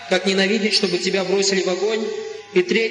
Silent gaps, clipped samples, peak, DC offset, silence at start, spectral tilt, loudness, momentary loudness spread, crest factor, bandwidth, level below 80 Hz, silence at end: none; under 0.1%; -4 dBFS; under 0.1%; 0 s; -3.5 dB/octave; -19 LUFS; 6 LU; 16 dB; 10.5 kHz; -68 dBFS; 0 s